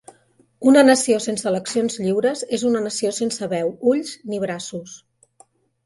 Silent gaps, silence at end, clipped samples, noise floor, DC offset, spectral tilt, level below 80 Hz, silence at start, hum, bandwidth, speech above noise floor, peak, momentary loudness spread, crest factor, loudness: none; 0.9 s; under 0.1%; -58 dBFS; under 0.1%; -4 dB/octave; -66 dBFS; 0.6 s; none; 11.5 kHz; 39 dB; 0 dBFS; 14 LU; 20 dB; -20 LUFS